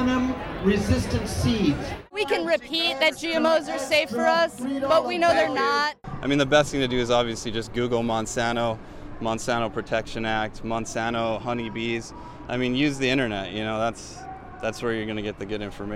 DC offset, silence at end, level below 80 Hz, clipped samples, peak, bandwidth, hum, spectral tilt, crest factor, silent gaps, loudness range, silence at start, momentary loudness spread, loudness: under 0.1%; 0 s; -42 dBFS; under 0.1%; -6 dBFS; 16 kHz; none; -4.5 dB/octave; 18 dB; none; 5 LU; 0 s; 11 LU; -25 LUFS